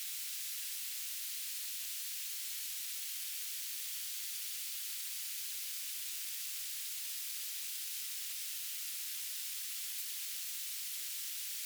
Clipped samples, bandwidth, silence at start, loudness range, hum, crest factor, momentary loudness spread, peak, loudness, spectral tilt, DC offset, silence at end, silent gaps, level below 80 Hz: under 0.1%; over 20 kHz; 0 s; 0 LU; none; 14 dB; 0 LU; -28 dBFS; -38 LUFS; 10 dB/octave; under 0.1%; 0 s; none; under -90 dBFS